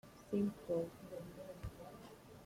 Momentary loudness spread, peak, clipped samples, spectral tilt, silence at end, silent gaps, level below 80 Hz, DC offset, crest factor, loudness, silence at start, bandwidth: 15 LU; -26 dBFS; under 0.1%; -7.5 dB/octave; 0 s; none; -64 dBFS; under 0.1%; 18 dB; -44 LUFS; 0.05 s; 16.5 kHz